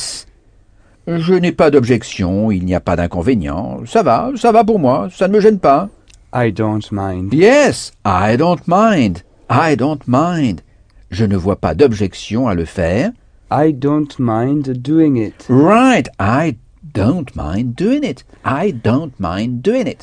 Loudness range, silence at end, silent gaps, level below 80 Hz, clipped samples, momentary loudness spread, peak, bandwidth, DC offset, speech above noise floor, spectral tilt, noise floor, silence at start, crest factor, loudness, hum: 3 LU; 0 s; none; -38 dBFS; under 0.1%; 10 LU; 0 dBFS; 10 kHz; under 0.1%; 34 dB; -7 dB/octave; -48 dBFS; 0 s; 14 dB; -14 LUFS; none